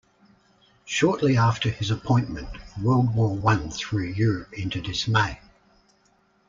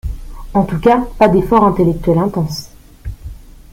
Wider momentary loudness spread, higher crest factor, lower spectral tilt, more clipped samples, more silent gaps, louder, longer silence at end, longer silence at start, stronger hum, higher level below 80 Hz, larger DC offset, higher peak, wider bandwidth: second, 10 LU vs 21 LU; about the same, 18 dB vs 14 dB; second, -6 dB/octave vs -7.5 dB/octave; neither; neither; second, -24 LUFS vs -14 LUFS; first, 1.15 s vs 0.2 s; first, 0.85 s vs 0.05 s; neither; second, -46 dBFS vs -30 dBFS; neither; second, -6 dBFS vs 0 dBFS; second, 7.6 kHz vs 16 kHz